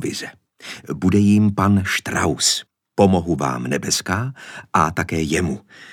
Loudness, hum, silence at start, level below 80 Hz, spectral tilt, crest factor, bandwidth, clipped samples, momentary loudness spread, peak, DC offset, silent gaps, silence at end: -19 LUFS; none; 0 s; -46 dBFS; -4.5 dB/octave; 20 dB; 17.5 kHz; under 0.1%; 15 LU; 0 dBFS; under 0.1%; none; 0 s